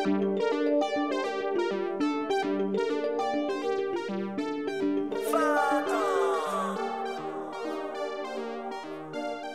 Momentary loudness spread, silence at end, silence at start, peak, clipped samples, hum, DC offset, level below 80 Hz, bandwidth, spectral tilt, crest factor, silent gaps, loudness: 9 LU; 0 s; 0 s; -14 dBFS; under 0.1%; none; 0.1%; -74 dBFS; 15 kHz; -5 dB/octave; 16 dB; none; -30 LUFS